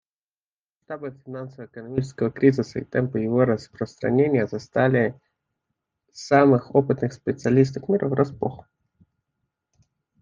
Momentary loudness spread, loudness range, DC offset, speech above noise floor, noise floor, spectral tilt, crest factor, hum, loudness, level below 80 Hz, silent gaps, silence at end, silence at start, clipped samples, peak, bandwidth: 16 LU; 4 LU; under 0.1%; over 68 dB; under -90 dBFS; -8 dB/octave; 22 dB; none; -22 LUFS; -60 dBFS; none; 1.65 s; 0.9 s; under 0.1%; -2 dBFS; 7.6 kHz